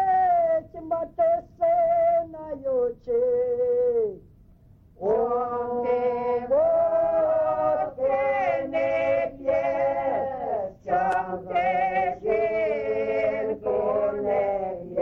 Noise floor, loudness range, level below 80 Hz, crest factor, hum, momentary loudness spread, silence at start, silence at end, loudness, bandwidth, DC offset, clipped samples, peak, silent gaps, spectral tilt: -53 dBFS; 2 LU; -56 dBFS; 12 dB; none; 7 LU; 0 s; 0 s; -25 LUFS; 6.2 kHz; under 0.1%; under 0.1%; -12 dBFS; none; -7.5 dB/octave